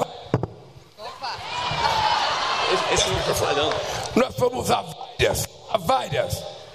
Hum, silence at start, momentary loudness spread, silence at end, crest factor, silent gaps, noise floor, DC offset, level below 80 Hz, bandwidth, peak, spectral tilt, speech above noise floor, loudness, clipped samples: none; 0 s; 11 LU; 0 s; 18 dB; none; -45 dBFS; 0.1%; -44 dBFS; 15 kHz; -6 dBFS; -3.5 dB/octave; 22 dB; -23 LUFS; under 0.1%